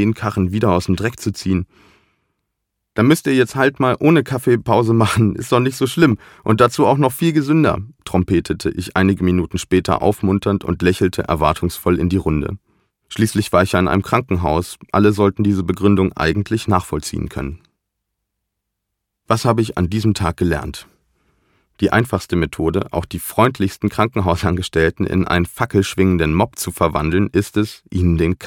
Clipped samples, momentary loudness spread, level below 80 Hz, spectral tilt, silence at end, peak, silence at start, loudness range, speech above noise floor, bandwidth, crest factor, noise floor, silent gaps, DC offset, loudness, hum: under 0.1%; 7 LU; -36 dBFS; -6.5 dB/octave; 0 s; 0 dBFS; 0 s; 5 LU; 61 dB; 17.5 kHz; 16 dB; -77 dBFS; none; under 0.1%; -17 LUFS; none